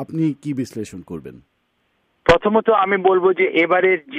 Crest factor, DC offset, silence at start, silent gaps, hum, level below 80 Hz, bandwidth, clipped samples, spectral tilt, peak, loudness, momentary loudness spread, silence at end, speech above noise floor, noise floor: 18 dB; under 0.1%; 0 s; none; none; -44 dBFS; 10.5 kHz; under 0.1%; -6.5 dB/octave; -2 dBFS; -17 LUFS; 16 LU; 0 s; 49 dB; -67 dBFS